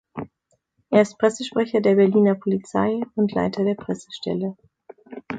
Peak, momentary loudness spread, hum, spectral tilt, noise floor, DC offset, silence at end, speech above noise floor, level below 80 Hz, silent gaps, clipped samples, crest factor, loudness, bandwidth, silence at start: -4 dBFS; 18 LU; none; -6.5 dB/octave; -70 dBFS; under 0.1%; 0 s; 49 dB; -60 dBFS; none; under 0.1%; 18 dB; -21 LUFS; 9.2 kHz; 0.15 s